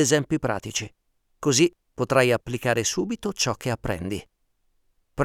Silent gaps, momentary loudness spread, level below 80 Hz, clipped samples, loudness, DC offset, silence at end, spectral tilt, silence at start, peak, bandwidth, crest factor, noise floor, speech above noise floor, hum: none; 11 LU; -52 dBFS; under 0.1%; -24 LUFS; under 0.1%; 0 s; -4 dB/octave; 0 s; -4 dBFS; 17 kHz; 22 dB; -69 dBFS; 44 dB; none